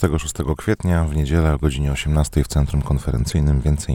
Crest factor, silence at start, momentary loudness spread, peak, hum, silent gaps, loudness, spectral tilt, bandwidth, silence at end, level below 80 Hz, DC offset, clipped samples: 16 dB; 0 s; 3 LU; -2 dBFS; none; none; -20 LUFS; -6.5 dB/octave; 16 kHz; 0 s; -24 dBFS; under 0.1%; under 0.1%